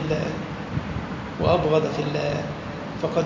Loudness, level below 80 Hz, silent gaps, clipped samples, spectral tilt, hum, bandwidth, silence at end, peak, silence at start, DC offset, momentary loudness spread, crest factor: -26 LUFS; -42 dBFS; none; under 0.1%; -7 dB/octave; none; 7.6 kHz; 0 s; -6 dBFS; 0 s; under 0.1%; 11 LU; 18 dB